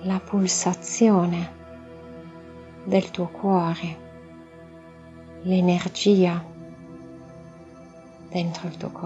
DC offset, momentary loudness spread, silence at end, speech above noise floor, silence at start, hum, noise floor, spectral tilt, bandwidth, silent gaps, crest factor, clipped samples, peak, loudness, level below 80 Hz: under 0.1%; 26 LU; 0 s; 23 dB; 0 s; none; -45 dBFS; -5.5 dB/octave; 8.2 kHz; none; 18 dB; under 0.1%; -6 dBFS; -23 LUFS; -56 dBFS